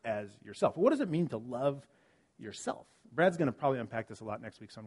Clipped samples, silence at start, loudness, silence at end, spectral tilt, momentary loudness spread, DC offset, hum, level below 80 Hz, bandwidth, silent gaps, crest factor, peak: under 0.1%; 0.05 s; -33 LUFS; 0 s; -6.5 dB/octave; 18 LU; under 0.1%; none; -74 dBFS; 11.5 kHz; none; 22 dB; -12 dBFS